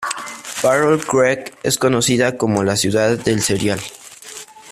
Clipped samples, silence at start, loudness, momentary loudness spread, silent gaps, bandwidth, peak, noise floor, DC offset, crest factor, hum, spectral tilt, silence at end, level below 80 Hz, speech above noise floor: under 0.1%; 0 s; -17 LUFS; 18 LU; none; 15.5 kHz; -2 dBFS; -37 dBFS; under 0.1%; 16 dB; none; -4 dB/octave; 0 s; -50 dBFS; 20 dB